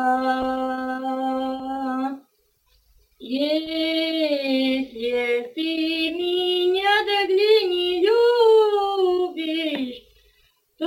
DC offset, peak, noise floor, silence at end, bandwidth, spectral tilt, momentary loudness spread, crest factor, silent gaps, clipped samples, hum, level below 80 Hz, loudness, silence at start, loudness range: under 0.1%; -6 dBFS; -64 dBFS; 0 s; 17 kHz; -3.5 dB/octave; 10 LU; 16 dB; none; under 0.1%; none; -60 dBFS; -21 LUFS; 0 s; 8 LU